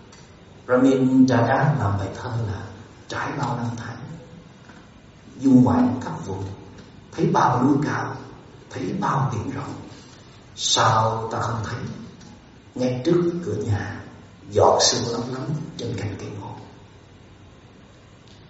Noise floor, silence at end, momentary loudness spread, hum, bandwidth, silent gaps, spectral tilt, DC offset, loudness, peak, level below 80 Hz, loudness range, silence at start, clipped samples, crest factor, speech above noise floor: -48 dBFS; 0.1 s; 22 LU; none; 8 kHz; none; -5 dB/octave; under 0.1%; -22 LUFS; -2 dBFS; -54 dBFS; 6 LU; 0 s; under 0.1%; 20 dB; 27 dB